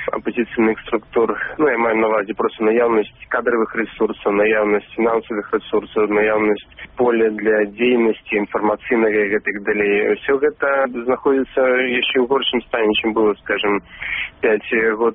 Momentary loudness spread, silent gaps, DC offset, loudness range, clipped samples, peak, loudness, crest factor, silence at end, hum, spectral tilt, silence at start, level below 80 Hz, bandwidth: 6 LU; none; under 0.1%; 1 LU; under 0.1%; -4 dBFS; -18 LUFS; 14 dB; 0 s; none; -2.5 dB/octave; 0 s; -52 dBFS; 3.8 kHz